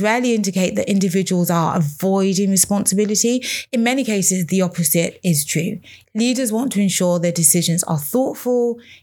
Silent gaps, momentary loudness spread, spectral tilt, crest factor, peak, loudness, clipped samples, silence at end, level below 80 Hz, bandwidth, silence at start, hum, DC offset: none; 6 LU; -4.5 dB/octave; 18 dB; 0 dBFS; -17 LUFS; under 0.1%; 0.1 s; -62 dBFS; 19.5 kHz; 0 s; none; under 0.1%